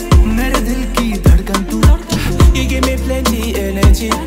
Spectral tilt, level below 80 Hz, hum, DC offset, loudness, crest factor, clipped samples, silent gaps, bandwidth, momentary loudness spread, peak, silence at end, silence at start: -5.5 dB/octave; -14 dBFS; none; under 0.1%; -14 LUFS; 12 dB; under 0.1%; none; 16.5 kHz; 5 LU; 0 dBFS; 0 s; 0 s